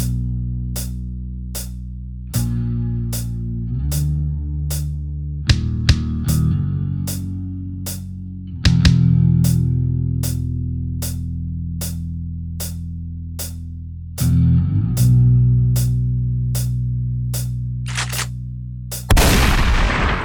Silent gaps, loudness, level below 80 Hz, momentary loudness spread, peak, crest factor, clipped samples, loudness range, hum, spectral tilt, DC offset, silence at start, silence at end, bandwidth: none; -20 LUFS; -26 dBFS; 15 LU; 0 dBFS; 18 dB; under 0.1%; 8 LU; none; -5.5 dB/octave; under 0.1%; 0 s; 0 s; over 20 kHz